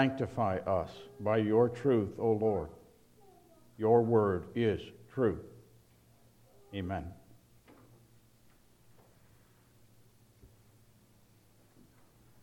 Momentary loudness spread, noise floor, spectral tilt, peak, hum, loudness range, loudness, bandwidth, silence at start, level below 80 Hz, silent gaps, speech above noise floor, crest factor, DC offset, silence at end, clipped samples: 16 LU; -64 dBFS; -8.5 dB/octave; -12 dBFS; none; 16 LU; -32 LUFS; 13.5 kHz; 0 s; -62 dBFS; none; 33 dB; 22 dB; under 0.1%; 1.95 s; under 0.1%